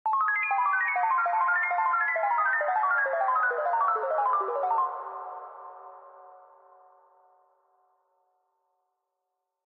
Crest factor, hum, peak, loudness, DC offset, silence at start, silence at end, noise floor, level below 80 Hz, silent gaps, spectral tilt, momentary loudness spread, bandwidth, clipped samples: 14 dB; none; -16 dBFS; -26 LUFS; under 0.1%; 0.05 s; 3.3 s; -83 dBFS; under -90 dBFS; none; -2.5 dB/octave; 15 LU; 5 kHz; under 0.1%